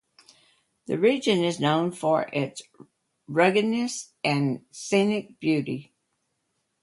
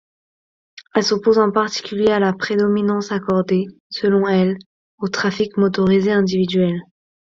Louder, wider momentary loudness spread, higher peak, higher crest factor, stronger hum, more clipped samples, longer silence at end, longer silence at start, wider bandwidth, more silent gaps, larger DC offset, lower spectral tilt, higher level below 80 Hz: second, -25 LUFS vs -18 LUFS; first, 11 LU vs 7 LU; second, -6 dBFS vs 0 dBFS; about the same, 20 dB vs 18 dB; neither; neither; first, 1 s vs 0.5 s; first, 0.9 s vs 0.75 s; first, 11.5 kHz vs 7.6 kHz; second, none vs 3.80-3.90 s, 4.66-4.98 s; neither; about the same, -5 dB/octave vs -6 dB/octave; second, -70 dBFS vs -56 dBFS